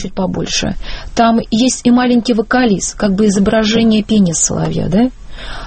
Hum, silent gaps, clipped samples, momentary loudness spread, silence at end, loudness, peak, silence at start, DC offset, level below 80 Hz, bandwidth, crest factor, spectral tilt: none; none; under 0.1%; 8 LU; 0 s; -13 LUFS; 0 dBFS; 0 s; under 0.1%; -30 dBFS; 8.8 kHz; 14 dB; -4.5 dB/octave